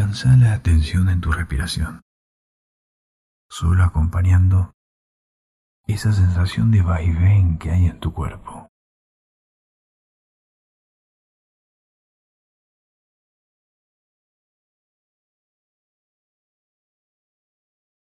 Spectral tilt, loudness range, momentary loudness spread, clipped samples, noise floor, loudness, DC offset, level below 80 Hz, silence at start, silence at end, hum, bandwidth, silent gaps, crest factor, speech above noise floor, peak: -7 dB/octave; 6 LU; 14 LU; under 0.1%; under -90 dBFS; -18 LUFS; under 0.1%; -32 dBFS; 0 s; 9.4 s; none; 12 kHz; 2.02-3.50 s, 4.74-5.84 s; 16 dB; over 73 dB; -6 dBFS